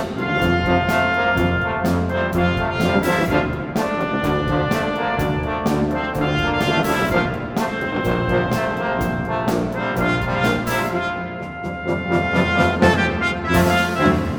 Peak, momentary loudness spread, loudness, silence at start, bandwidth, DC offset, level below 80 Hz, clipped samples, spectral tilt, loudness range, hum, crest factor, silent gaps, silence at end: -2 dBFS; 6 LU; -20 LUFS; 0 s; over 20 kHz; under 0.1%; -36 dBFS; under 0.1%; -6 dB/octave; 2 LU; none; 18 dB; none; 0 s